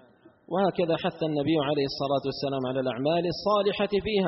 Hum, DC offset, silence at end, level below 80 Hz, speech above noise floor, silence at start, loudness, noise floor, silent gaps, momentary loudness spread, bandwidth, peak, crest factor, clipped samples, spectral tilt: none; under 0.1%; 0 s; -56 dBFS; 29 dB; 0.5 s; -27 LUFS; -55 dBFS; none; 4 LU; 6 kHz; -12 dBFS; 14 dB; under 0.1%; -4.5 dB/octave